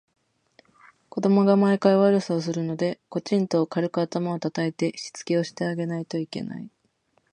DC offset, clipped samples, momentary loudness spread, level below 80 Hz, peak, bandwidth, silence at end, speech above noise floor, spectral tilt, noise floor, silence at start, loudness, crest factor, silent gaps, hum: under 0.1%; under 0.1%; 14 LU; -72 dBFS; -6 dBFS; 10 kHz; 0.65 s; 45 dB; -6.5 dB/octave; -68 dBFS; 1.15 s; -24 LUFS; 20 dB; none; none